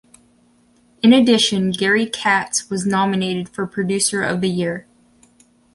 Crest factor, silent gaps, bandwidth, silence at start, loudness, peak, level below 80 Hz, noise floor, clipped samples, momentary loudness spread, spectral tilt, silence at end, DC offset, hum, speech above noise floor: 18 dB; none; 11.5 kHz; 1.05 s; -17 LUFS; -2 dBFS; -58 dBFS; -56 dBFS; under 0.1%; 11 LU; -4 dB/octave; 0.95 s; under 0.1%; none; 38 dB